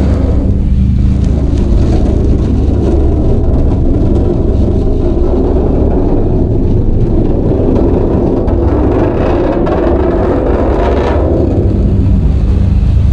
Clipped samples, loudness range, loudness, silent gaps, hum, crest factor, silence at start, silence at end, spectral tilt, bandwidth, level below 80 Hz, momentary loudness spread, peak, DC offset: under 0.1%; 1 LU; -11 LUFS; none; none; 8 dB; 0 s; 0 s; -10 dB/octave; 6.8 kHz; -12 dBFS; 2 LU; 0 dBFS; under 0.1%